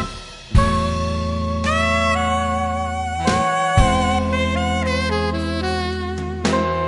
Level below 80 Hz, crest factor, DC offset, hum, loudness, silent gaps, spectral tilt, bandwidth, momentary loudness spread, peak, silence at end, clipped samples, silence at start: -28 dBFS; 18 dB; under 0.1%; none; -20 LUFS; none; -5.5 dB/octave; 11.5 kHz; 6 LU; -2 dBFS; 0 s; under 0.1%; 0 s